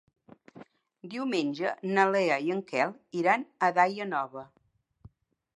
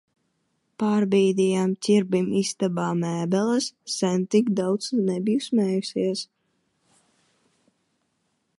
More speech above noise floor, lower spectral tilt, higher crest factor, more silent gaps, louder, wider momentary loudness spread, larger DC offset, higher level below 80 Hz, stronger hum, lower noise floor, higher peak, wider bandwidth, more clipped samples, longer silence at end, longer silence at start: second, 40 dB vs 50 dB; about the same, -5.5 dB/octave vs -5.5 dB/octave; first, 22 dB vs 16 dB; neither; second, -28 LUFS vs -24 LUFS; first, 10 LU vs 6 LU; neither; about the same, -74 dBFS vs -72 dBFS; neither; second, -68 dBFS vs -73 dBFS; about the same, -8 dBFS vs -8 dBFS; about the same, 11 kHz vs 11.5 kHz; neither; second, 1.1 s vs 2.35 s; second, 0.55 s vs 0.8 s